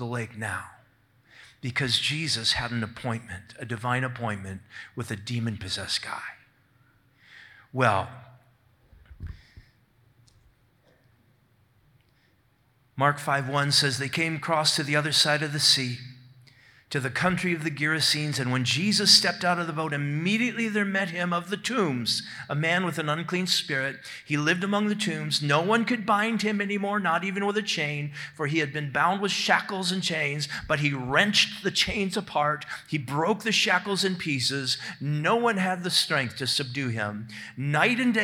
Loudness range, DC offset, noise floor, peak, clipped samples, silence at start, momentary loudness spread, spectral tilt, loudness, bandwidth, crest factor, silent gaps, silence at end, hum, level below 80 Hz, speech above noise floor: 9 LU; under 0.1%; -65 dBFS; -4 dBFS; under 0.1%; 0 s; 12 LU; -3.5 dB/octave; -25 LUFS; 17 kHz; 24 dB; none; 0 s; none; -60 dBFS; 39 dB